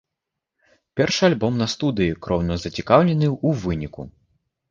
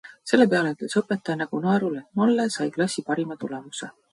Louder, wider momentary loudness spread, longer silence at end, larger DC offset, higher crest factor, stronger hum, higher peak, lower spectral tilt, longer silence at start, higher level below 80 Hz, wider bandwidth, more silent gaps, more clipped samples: first, -21 LUFS vs -24 LUFS; about the same, 14 LU vs 13 LU; first, 0.6 s vs 0.25 s; neither; about the same, 20 dB vs 22 dB; neither; first, 0 dBFS vs -4 dBFS; about the same, -6 dB/octave vs -5.5 dB/octave; first, 0.95 s vs 0.05 s; first, -42 dBFS vs -70 dBFS; second, 7.4 kHz vs 11.5 kHz; neither; neither